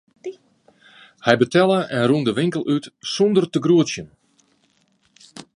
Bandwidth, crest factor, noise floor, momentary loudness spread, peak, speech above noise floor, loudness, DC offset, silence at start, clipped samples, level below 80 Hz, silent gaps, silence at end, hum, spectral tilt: 11 kHz; 20 dB; -63 dBFS; 18 LU; 0 dBFS; 45 dB; -19 LUFS; under 0.1%; 0.25 s; under 0.1%; -64 dBFS; none; 0.15 s; none; -5.5 dB/octave